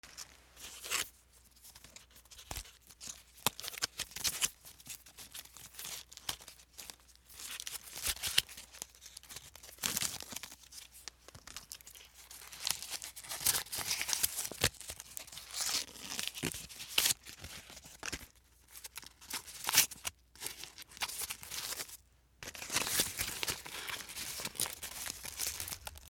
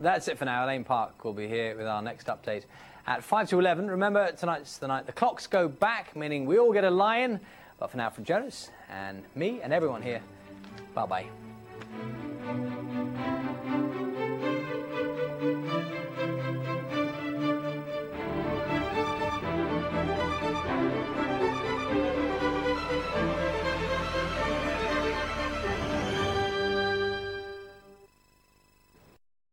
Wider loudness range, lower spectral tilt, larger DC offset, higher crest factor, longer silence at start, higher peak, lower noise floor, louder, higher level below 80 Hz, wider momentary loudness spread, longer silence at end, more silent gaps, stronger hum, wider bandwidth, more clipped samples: about the same, 7 LU vs 7 LU; second, 0 dB/octave vs -6 dB/octave; neither; first, 34 dB vs 20 dB; about the same, 0.05 s vs 0 s; about the same, -8 dBFS vs -10 dBFS; about the same, -63 dBFS vs -64 dBFS; second, -37 LUFS vs -30 LUFS; second, -62 dBFS vs -50 dBFS; first, 19 LU vs 12 LU; second, 0 s vs 1.45 s; neither; neither; first, over 20 kHz vs 16.5 kHz; neither